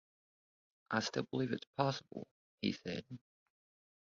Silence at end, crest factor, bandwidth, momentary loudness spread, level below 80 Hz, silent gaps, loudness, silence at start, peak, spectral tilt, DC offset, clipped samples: 0.95 s; 24 dB; 7.4 kHz; 16 LU; -76 dBFS; 1.67-1.74 s, 2.31-2.58 s; -39 LUFS; 0.9 s; -18 dBFS; -4 dB/octave; under 0.1%; under 0.1%